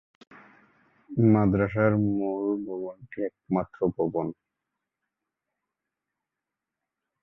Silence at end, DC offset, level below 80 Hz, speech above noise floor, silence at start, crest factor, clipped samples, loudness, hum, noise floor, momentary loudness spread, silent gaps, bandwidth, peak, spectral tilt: 2.9 s; under 0.1%; -54 dBFS; 62 dB; 1.1 s; 20 dB; under 0.1%; -26 LUFS; none; -87 dBFS; 13 LU; none; 3.9 kHz; -10 dBFS; -12 dB/octave